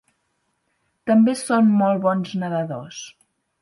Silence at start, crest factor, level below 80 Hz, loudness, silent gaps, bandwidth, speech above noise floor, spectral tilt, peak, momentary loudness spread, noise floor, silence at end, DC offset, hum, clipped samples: 1.05 s; 16 dB; -70 dBFS; -20 LUFS; none; 11.5 kHz; 52 dB; -6.5 dB/octave; -6 dBFS; 18 LU; -71 dBFS; 0.55 s; under 0.1%; none; under 0.1%